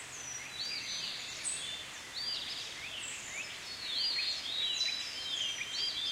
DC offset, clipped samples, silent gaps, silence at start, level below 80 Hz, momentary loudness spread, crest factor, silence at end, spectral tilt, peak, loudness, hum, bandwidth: under 0.1%; under 0.1%; none; 0 s; -70 dBFS; 9 LU; 16 dB; 0 s; 1 dB/octave; -22 dBFS; -35 LUFS; none; 16 kHz